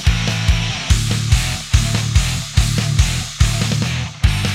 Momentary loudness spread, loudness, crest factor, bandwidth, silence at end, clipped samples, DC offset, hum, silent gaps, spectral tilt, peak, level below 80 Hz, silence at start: 2 LU; -17 LUFS; 16 dB; 16 kHz; 0 s; under 0.1%; under 0.1%; none; none; -4 dB/octave; 0 dBFS; -20 dBFS; 0 s